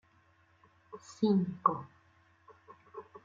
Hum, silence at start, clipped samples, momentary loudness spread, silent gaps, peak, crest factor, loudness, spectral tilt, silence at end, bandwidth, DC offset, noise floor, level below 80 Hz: none; 0.9 s; under 0.1%; 23 LU; none; -12 dBFS; 26 dB; -32 LUFS; -8 dB/octave; 0.05 s; 7.6 kHz; under 0.1%; -67 dBFS; -78 dBFS